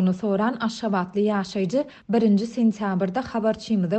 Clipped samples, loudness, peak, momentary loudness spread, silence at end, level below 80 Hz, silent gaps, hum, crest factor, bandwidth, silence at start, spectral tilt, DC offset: under 0.1%; -24 LUFS; -10 dBFS; 5 LU; 0 s; -60 dBFS; none; none; 12 dB; 8.6 kHz; 0 s; -7 dB/octave; under 0.1%